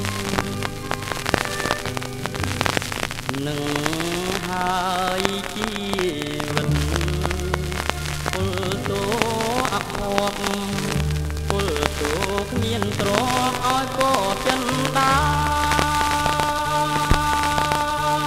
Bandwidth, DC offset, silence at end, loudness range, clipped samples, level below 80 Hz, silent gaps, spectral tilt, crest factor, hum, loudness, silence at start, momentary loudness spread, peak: 16 kHz; under 0.1%; 0 s; 4 LU; under 0.1%; -34 dBFS; none; -4 dB/octave; 22 dB; none; -22 LUFS; 0 s; 6 LU; 0 dBFS